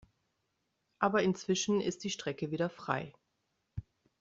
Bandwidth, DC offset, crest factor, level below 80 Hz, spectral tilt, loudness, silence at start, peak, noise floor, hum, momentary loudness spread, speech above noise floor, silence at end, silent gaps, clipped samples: 8 kHz; under 0.1%; 22 dB; -64 dBFS; -4.5 dB/octave; -34 LUFS; 1 s; -14 dBFS; -81 dBFS; none; 18 LU; 48 dB; 0.4 s; none; under 0.1%